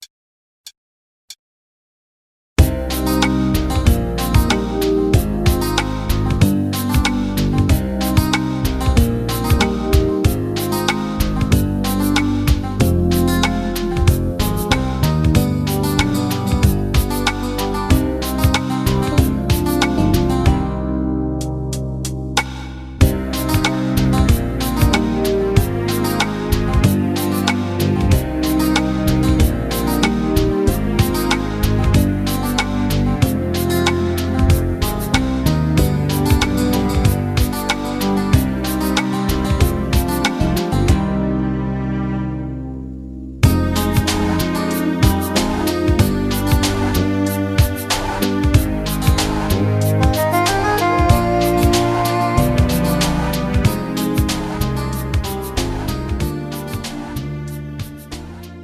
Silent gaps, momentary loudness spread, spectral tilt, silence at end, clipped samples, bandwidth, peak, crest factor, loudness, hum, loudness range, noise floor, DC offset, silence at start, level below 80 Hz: 0.10-0.64 s, 0.77-1.28 s, 1.39-2.56 s; 6 LU; -5.5 dB/octave; 0 s; under 0.1%; 15 kHz; 0 dBFS; 16 dB; -17 LUFS; none; 3 LU; under -90 dBFS; under 0.1%; 0 s; -24 dBFS